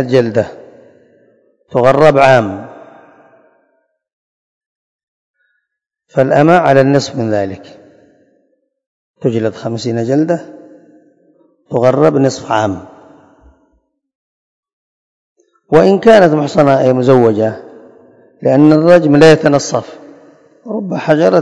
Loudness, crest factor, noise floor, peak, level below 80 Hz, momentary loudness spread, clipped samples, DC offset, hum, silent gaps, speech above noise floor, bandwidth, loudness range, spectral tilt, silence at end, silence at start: -11 LUFS; 14 dB; -75 dBFS; 0 dBFS; -50 dBFS; 14 LU; 1%; under 0.1%; none; 4.13-5.34 s, 8.86-9.14 s, 14.15-14.63 s, 14.73-15.36 s; 65 dB; 11 kHz; 9 LU; -6.5 dB/octave; 0 s; 0 s